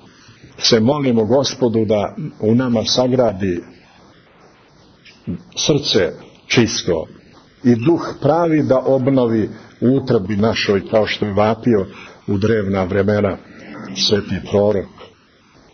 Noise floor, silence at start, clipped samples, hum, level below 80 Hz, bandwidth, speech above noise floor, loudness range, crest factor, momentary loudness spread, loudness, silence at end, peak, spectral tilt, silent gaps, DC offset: -50 dBFS; 0.45 s; under 0.1%; none; -48 dBFS; 6.6 kHz; 34 dB; 4 LU; 16 dB; 12 LU; -17 LUFS; 0.65 s; -2 dBFS; -5.5 dB/octave; none; under 0.1%